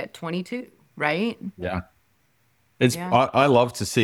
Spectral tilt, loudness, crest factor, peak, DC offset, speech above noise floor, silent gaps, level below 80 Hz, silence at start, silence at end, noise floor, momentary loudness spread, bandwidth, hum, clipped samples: -5 dB/octave; -23 LUFS; 20 dB; -4 dBFS; under 0.1%; 43 dB; none; -56 dBFS; 0 s; 0 s; -66 dBFS; 14 LU; 17 kHz; none; under 0.1%